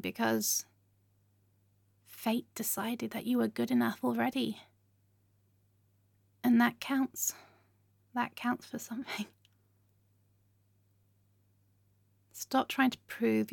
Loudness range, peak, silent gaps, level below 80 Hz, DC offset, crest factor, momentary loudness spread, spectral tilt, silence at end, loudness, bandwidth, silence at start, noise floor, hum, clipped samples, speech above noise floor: 9 LU; -16 dBFS; none; -78 dBFS; under 0.1%; 20 dB; 12 LU; -3.5 dB/octave; 0 s; -33 LUFS; 17.5 kHz; 0.05 s; -71 dBFS; 50 Hz at -70 dBFS; under 0.1%; 38 dB